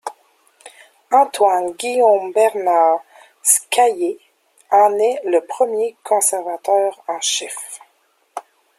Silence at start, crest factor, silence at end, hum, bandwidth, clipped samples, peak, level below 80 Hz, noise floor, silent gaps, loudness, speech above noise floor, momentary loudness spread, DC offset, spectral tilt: 0.05 s; 18 dB; 0.4 s; none; 16.5 kHz; under 0.1%; 0 dBFS; -74 dBFS; -61 dBFS; none; -17 LUFS; 45 dB; 19 LU; under 0.1%; -0.5 dB/octave